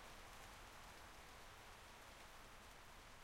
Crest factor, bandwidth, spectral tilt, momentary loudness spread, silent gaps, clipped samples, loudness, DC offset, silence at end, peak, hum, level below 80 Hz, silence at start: 14 dB; 16 kHz; -2.5 dB/octave; 2 LU; none; under 0.1%; -59 LUFS; under 0.1%; 0 s; -46 dBFS; none; -66 dBFS; 0 s